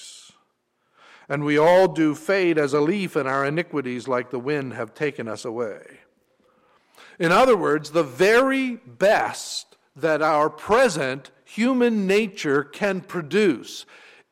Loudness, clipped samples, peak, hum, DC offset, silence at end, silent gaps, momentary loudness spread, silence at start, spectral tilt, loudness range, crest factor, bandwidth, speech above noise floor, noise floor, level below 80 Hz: -22 LUFS; under 0.1%; -8 dBFS; none; under 0.1%; 0.5 s; none; 13 LU; 0 s; -5 dB/octave; 6 LU; 14 dB; 16 kHz; 49 dB; -70 dBFS; -60 dBFS